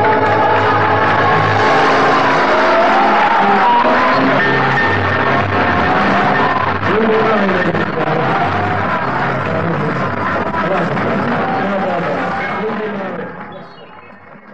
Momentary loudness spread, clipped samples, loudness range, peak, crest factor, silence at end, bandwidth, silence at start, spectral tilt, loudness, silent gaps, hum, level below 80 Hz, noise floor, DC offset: 7 LU; under 0.1%; 6 LU; -2 dBFS; 12 dB; 0 s; 8.8 kHz; 0 s; -6.5 dB/octave; -13 LUFS; none; none; -46 dBFS; -37 dBFS; 3%